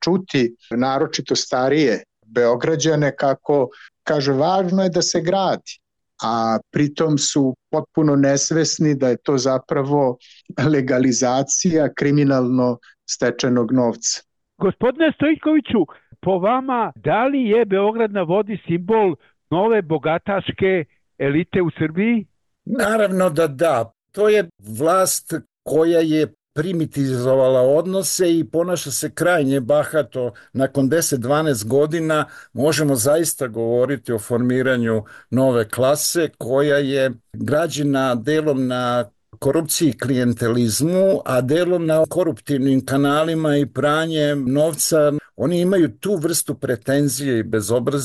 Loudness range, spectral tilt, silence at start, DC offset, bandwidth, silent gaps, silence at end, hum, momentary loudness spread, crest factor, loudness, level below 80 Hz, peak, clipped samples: 2 LU; -5 dB/octave; 0 s; under 0.1%; 13 kHz; none; 0 s; none; 6 LU; 12 dB; -19 LUFS; -56 dBFS; -8 dBFS; under 0.1%